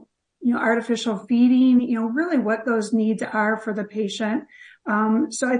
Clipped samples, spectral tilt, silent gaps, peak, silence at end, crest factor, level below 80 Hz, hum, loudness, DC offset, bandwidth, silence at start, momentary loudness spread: under 0.1%; -5 dB/octave; none; -6 dBFS; 0 s; 14 dB; -70 dBFS; none; -21 LUFS; under 0.1%; 10.5 kHz; 0.4 s; 9 LU